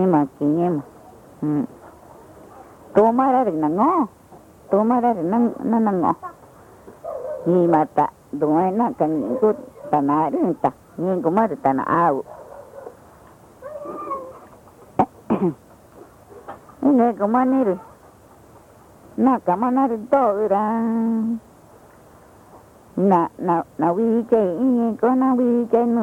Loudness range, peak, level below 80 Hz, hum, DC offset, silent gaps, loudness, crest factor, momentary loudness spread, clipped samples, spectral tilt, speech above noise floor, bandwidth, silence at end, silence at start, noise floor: 6 LU; -6 dBFS; -60 dBFS; none; under 0.1%; none; -20 LUFS; 16 dB; 14 LU; under 0.1%; -9.5 dB/octave; 29 dB; 11.5 kHz; 0 s; 0 s; -48 dBFS